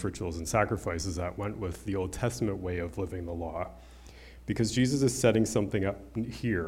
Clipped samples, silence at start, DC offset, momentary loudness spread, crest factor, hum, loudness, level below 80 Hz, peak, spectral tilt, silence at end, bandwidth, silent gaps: under 0.1%; 0 s; under 0.1%; 11 LU; 20 dB; none; -31 LUFS; -48 dBFS; -10 dBFS; -5.5 dB/octave; 0 s; 16.5 kHz; none